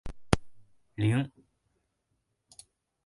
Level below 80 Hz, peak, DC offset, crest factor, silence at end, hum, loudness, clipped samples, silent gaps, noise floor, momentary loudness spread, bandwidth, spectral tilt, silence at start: -48 dBFS; -4 dBFS; under 0.1%; 32 dB; 1.8 s; none; -31 LUFS; under 0.1%; none; -79 dBFS; 12 LU; 11.5 kHz; -6.5 dB/octave; 0.05 s